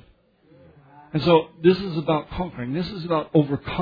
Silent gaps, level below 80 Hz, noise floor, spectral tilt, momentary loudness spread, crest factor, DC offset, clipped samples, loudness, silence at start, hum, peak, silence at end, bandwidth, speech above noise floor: none; -48 dBFS; -57 dBFS; -9 dB/octave; 10 LU; 20 dB; under 0.1%; under 0.1%; -23 LUFS; 1.15 s; none; -4 dBFS; 0 s; 5 kHz; 35 dB